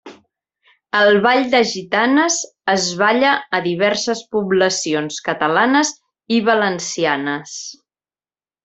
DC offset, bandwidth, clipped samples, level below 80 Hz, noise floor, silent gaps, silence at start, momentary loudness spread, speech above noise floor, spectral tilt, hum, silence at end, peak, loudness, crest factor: under 0.1%; 8.4 kHz; under 0.1%; -64 dBFS; under -90 dBFS; none; 0.05 s; 8 LU; over 73 dB; -3 dB/octave; none; 0.9 s; 0 dBFS; -17 LUFS; 18 dB